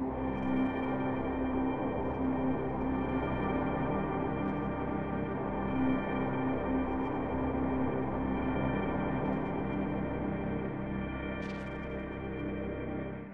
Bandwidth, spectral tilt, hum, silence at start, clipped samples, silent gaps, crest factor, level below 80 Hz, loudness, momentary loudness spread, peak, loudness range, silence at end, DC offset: 4.9 kHz; -10 dB/octave; none; 0 s; under 0.1%; none; 14 dB; -46 dBFS; -34 LUFS; 5 LU; -18 dBFS; 3 LU; 0 s; 0.3%